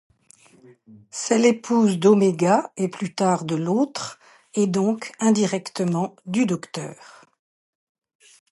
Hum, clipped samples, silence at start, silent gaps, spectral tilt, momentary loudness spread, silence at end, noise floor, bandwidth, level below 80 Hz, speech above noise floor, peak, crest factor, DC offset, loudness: none; under 0.1%; 0.9 s; none; -5.5 dB/octave; 13 LU; 1.55 s; -55 dBFS; 11.5 kHz; -70 dBFS; 33 dB; -4 dBFS; 18 dB; under 0.1%; -22 LUFS